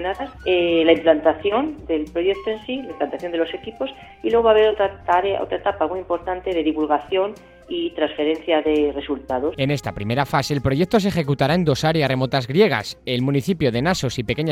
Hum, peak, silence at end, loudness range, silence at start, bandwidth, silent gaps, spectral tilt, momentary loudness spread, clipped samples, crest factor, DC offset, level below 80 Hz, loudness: none; -2 dBFS; 0 s; 3 LU; 0 s; 15.5 kHz; none; -6 dB/octave; 10 LU; under 0.1%; 18 dB; under 0.1%; -46 dBFS; -21 LUFS